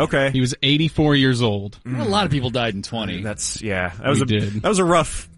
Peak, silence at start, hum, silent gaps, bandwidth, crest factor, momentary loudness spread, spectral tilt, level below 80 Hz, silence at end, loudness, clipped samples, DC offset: -4 dBFS; 0 s; none; none; 11.5 kHz; 16 dB; 9 LU; -5 dB/octave; -42 dBFS; 0.1 s; -20 LUFS; under 0.1%; under 0.1%